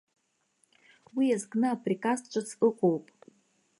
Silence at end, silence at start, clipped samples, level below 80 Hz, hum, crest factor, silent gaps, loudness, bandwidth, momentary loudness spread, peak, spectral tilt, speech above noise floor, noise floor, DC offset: 0.8 s; 1.15 s; under 0.1%; -84 dBFS; none; 18 dB; none; -29 LUFS; 11.5 kHz; 9 LU; -12 dBFS; -6 dB/octave; 44 dB; -73 dBFS; under 0.1%